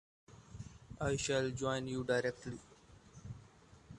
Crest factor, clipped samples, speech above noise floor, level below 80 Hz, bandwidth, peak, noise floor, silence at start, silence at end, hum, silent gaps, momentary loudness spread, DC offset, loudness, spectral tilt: 20 dB; under 0.1%; 25 dB; -60 dBFS; 11.5 kHz; -22 dBFS; -61 dBFS; 0.3 s; 0 s; none; none; 20 LU; under 0.1%; -37 LUFS; -4.5 dB/octave